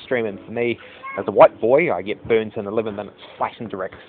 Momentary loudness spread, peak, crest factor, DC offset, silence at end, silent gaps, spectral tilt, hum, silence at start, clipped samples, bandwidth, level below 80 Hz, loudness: 16 LU; 0 dBFS; 20 dB; under 0.1%; 0.05 s; none; -10.5 dB/octave; none; 0 s; under 0.1%; 4.3 kHz; -58 dBFS; -20 LUFS